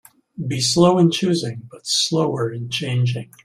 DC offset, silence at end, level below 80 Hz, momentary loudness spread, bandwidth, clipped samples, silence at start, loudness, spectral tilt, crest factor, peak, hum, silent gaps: under 0.1%; 0.2 s; -58 dBFS; 12 LU; 15 kHz; under 0.1%; 0.35 s; -19 LUFS; -5 dB/octave; 18 dB; -2 dBFS; none; none